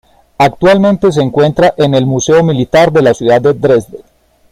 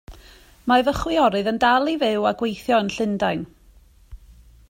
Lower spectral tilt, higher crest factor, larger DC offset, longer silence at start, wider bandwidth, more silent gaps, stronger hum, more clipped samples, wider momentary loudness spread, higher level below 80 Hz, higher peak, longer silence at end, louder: about the same, -6 dB/octave vs -5 dB/octave; second, 10 dB vs 18 dB; neither; first, 0.4 s vs 0.1 s; about the same, 15 kHz vs 16 kHz; neither; neither; neither; second, 3 LU vs 8 LU; about the same, -40 dBFS vs -44 dBFS; first, 0 dBFS vs -4 dBFS; about the same, 0.55 s vs 0.55 s; first, -9 LUFS vs -21 LUFS